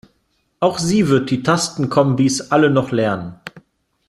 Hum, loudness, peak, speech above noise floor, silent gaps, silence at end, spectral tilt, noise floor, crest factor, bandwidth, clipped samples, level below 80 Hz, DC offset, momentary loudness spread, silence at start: none; -17 LUFS; -2 dBFS; 49 dB; none; 0.5 s; -5.5 dB/octave; -65 dBFS; 16 dB; 13 kHz; under 0.1%; -54 dBFS; under 0.1%; 11 LU; 0.6 s